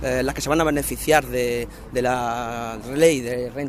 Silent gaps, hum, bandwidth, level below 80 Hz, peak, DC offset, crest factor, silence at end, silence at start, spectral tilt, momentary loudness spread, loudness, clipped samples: none; none; 15.5 kHz; -40 dBFS; -2 dBFS; under 0.1%; 20 dB; 0 s; 0 s; -4.5 dB/octave; 10 LU; -22 LUFS; under 0.1%